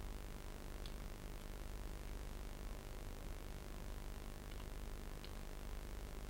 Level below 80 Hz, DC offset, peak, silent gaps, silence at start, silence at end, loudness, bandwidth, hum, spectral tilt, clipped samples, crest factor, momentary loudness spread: -50 dBFS; under 0.1%; -32 dBFS; none; 0 s; 0 s; -52 LUFS; 16.5 kHz; none; -5 dB/octave; under 0.1%; 16 dB; 1 LU